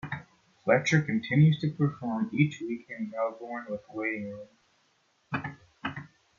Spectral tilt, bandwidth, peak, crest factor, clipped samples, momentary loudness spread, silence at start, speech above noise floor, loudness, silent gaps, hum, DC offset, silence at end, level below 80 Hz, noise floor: -7 dB/octave; 7.2 kHz; -10 dBFS; 20 dB; under 0.1%; 16 LU; 0.05 s; 42 dB; -29 LUFS; none; none; under 0.1%; 0.35 s; -68 dBFS; -70 dBFS